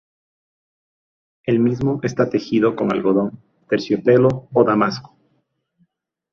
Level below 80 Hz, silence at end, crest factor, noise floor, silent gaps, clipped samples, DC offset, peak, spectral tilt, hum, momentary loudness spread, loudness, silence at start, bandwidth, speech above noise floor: -56 dBFS; 1.3 s; 18 dB; -68 dBFS; none; under 0.1%; under 0.1%; -2 dBFS; -7.5 dB/octave; none; 8 LU; -18 LUFS; 1.45 s; 7 kHz; 50 dB